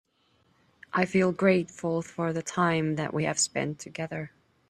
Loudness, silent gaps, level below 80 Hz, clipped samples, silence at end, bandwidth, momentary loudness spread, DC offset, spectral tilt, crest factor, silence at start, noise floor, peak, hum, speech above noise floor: -28 LUFS; none; -66 dBFS; under 0.1%; 0.4 s; 12.5 kHz; 11 LU; under 0.1%; -4.5 dB/octave; 20 dB; 0.95 s; -68 dBFS; -8 dBFS; none; 40 dB